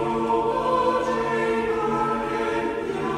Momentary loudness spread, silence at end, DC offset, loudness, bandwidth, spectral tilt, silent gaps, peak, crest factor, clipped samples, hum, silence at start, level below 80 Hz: 4 LU; 0 s; under 0.1%; -24 LUFS; 12 kHz; -6 dB/octave; none; -10 dBFS; 14 dB; under 0.1%; none; 0 s; -48 dBFS